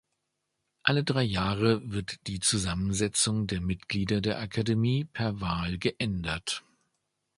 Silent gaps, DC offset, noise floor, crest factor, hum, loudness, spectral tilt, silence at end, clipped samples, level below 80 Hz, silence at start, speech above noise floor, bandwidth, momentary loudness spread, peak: none; under 0.1%; -81 dBFS; 24 dB; none; -29 LUFS; -4.5 dB/octave; 0.75 s; under 0.1%; -48 dBFS; 0.85 s; 53 dB; 11.5 kHz; 6 LU; -6 dBFS